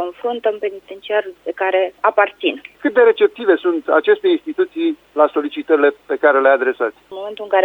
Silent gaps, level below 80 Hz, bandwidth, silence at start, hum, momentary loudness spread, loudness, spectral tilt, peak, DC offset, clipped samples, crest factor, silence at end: none; -66 dBFS; 4.2 kHz; 0 s; none; 10 LU; -17 LUFS; -5 dB/octave; 0 dBFS; under 0.1%; under 0.1%; 16 dB; 0 s